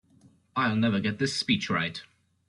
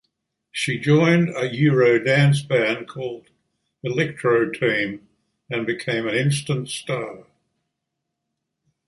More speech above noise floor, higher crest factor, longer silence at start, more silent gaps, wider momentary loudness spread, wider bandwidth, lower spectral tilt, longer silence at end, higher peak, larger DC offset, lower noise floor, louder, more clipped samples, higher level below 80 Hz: second, 33 dB vs 60 dB; about the same, 18 dB vs 20 dB; about the same, 0.55 s vs 0.55 s; neither; second, 9 LU vs 15 LU; about the same, 11.5 kHz vs 11.5 kHz; about the same, -5 dB/octave vs -6 dB/octave; second, 0.45 s vs 1.65 s; second, -12 dBFS vs -4 dBFS; neither; second, -60 dBFS vs -80 dBFS; second, -27 LUFS vs -21 LUFS; neither; about the same, -64 dBFS vs -62 dBFS